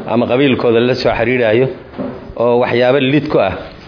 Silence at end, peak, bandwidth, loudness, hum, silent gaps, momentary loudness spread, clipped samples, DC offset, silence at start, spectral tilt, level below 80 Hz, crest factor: 0 s; -2 dBFS; 5.4 kHz; -13 LUFS; none; none; 11 LU; under 0.1%; under 0.1%; 0 s; -7.5 dB/octave; -42 dBFS; 12 dB